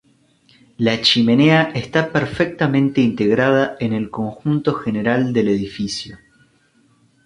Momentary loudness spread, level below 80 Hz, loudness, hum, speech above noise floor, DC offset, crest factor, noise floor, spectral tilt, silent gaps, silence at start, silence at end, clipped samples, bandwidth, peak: 11 LU; -52 dBFS; -17 LUFS; none; 40 dB; under 0.1%; 16 dB; -57 dBFS; -6 dB/octave; none; 0.8 s; 1.1 s; under 0.1%; 11 kHz; -2 dBFS